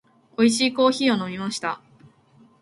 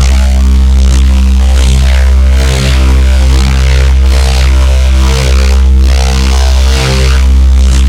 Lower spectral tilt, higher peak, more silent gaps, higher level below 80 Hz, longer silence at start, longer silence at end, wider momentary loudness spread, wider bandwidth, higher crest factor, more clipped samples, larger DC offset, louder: about the same, -4 dB/octave vs -5 dB/octave; second, -6 dBFS vs 0 dBFS; neither; second, -66 dBFS vs -6 dBFS; first, 0.4 s vs 0 s; first, 0.85 s vs 0 s; first, 13 LU vs 1 LU; about the same, 11.5 kHz vs 11.5 kHz; first, 18 dB vs 6 dB; second, under 0.1% vs 0.8%; neither; second, -22 LUFS vs -8 LUFS